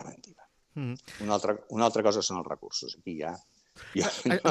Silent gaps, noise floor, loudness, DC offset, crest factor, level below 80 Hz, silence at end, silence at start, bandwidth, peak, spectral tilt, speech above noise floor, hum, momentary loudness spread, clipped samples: none; -59 dBFS; -30 LUFS; under 0.1%; 22 dB; -70 dBFS; 0 s; 0 s; 13.5 kHz; -8 dBFS; -4 dB/octave; 30 dB; none; 15 LU; under 0.1%